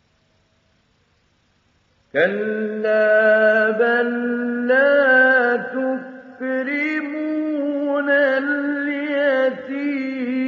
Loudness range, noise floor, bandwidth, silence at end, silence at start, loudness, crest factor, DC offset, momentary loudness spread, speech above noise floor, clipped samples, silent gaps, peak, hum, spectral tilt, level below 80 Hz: 5 LU; -62 dBFS; 6.6 kHz; 0 s; 2.15 s; -18 LUFS; 14 dB; under 0.1%; 10 LU; 45 dB; under 0.1%; none; -6 dBFS; none; -2.5 dB/octave; -74 dBFS